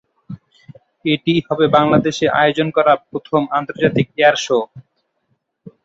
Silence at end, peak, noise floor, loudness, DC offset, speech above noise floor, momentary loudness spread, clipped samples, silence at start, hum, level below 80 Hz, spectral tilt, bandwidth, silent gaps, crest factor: 0.15 s; -2 dBFS; -68 dBFS; -16 LUFS; under 0.1%; 52 dB; 16 LU; under 0.1%; 0.3 s; none; -54 dBFS; -5.5 dB/octave; 7.8 kHz; none; 16 dB